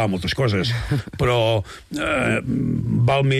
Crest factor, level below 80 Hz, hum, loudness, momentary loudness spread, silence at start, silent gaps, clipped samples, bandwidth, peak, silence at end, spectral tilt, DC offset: 10 dB; -40 dBFS; none; -21 LUFS; 6 LU; 0 s; none; under 0.1%; 14 kHz; -10 dBFS; 0 s; -6.5 dB/octave; under 0.1%